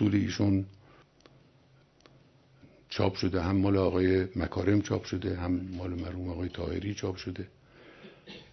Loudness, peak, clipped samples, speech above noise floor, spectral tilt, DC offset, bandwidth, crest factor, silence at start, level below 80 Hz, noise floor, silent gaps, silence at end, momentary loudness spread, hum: -30 LUFS; -12 dBFS; under 0.1%; 33 dB; -7 dB/octave; under 0.1%; 6.4 kHz; 20 dB; 0 s; -52 dBFS; -62 dBFS; none; 0.1 s; 17 LU; none